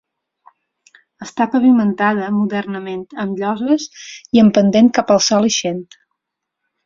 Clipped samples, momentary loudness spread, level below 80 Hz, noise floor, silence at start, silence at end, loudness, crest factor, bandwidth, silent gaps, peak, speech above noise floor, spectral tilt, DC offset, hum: under 0.1%; 15 LU; -58 dBFS; -79 dBFS; 1.2 s; 1.05 s; -15 LUFS; 16 dB; 7.6 kHz; none; -2 dBFS; 64 dB; -4.5 dB/octave; under 0.1%; none